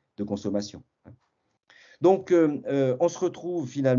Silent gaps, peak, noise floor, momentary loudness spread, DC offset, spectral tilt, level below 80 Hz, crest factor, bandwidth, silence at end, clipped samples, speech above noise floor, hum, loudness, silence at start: none; -8 dBFS; -66 dBFS; 10 LU; under 0.1%; -7 dB/octave; -70 dBFS; 18 dB; 7.4 kHz; 0 s; under 0.1%; 41 dB; none; -25 LUFS; 0.2 s